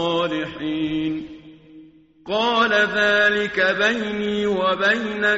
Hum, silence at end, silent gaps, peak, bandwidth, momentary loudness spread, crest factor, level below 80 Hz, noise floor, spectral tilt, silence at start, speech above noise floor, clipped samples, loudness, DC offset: none; 0 s; none; -6 dBFS; 8 kHz; 9 LU; 16 dB; -54 dBFS; -47 dBFS; -1.5 dB/octave; 0 s; 27 dB; under 0.1%; -20 LUFS; under 0.1%